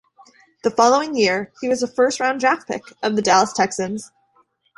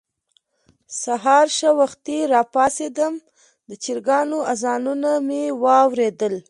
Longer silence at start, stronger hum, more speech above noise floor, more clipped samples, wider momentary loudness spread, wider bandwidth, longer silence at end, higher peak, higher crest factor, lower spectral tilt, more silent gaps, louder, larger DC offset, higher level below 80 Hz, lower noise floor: second, 0.65 s vs 0.9 s; neither; second, 42 dB vs 47 dB; neither; about the same, 10 LU vs 9 LU; about the same, 11.5 kHz vs 11.5 kHz; first, 0.7 s vs 0.1 s; about the same, -2 dBFS vs -2 dBFS; about the same, 18 dB vs 18 dB; about the same, -3 dB/octave vs -3 dB/octave; neither; about the same, -19 LUFS vs -19 LUFS; neither; first, -62 dBFS vs -68 dBFS; second, -61 dBFS vs -66 dBFS